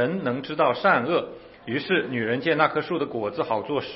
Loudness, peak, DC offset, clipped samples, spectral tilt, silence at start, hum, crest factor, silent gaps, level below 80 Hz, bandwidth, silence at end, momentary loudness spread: -24 LUFS; -4 dBFS; under 0.1%; under 0.1%; -10 dB/octave; 0 s; none; 22 dB; none; -64 dBFS; 5.8 kHz; 0 s; 8 LU